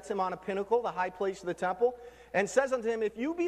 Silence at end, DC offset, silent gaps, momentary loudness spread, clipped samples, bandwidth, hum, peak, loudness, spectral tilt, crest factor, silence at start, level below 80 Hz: 0 s; under 0.1%; none; 6 LU; under 0.1%; 13 kHz; none; -14 dBFS; -31 LUFS; -5 dB/octave; 18 dB; 0 s; -64 dBFS